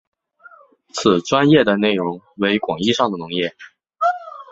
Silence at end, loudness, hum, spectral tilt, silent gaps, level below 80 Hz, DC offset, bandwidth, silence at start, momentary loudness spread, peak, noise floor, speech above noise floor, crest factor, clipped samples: 0.1 s; -18 LUFS; none; -5 dB/octave; none; -56 dBFS; under 0.1%; 8 kHz; 0.95 s; 12 LU; -2 dBFS; -48 dBFS; 30 dB; 18 dB; under 0.1%